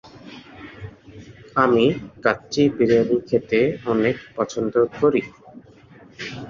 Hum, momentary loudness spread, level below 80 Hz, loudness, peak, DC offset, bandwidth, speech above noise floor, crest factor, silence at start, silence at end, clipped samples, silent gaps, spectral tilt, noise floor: none; 23 LU; -54 dBFS; -20 LUFS; -2 dBFS; under 0.1%; 7.4 kHz; 28 dB; 20 dB; 0.05 s; 0 s; under 0.1%; none; -6 dB/octave; -47 dBFS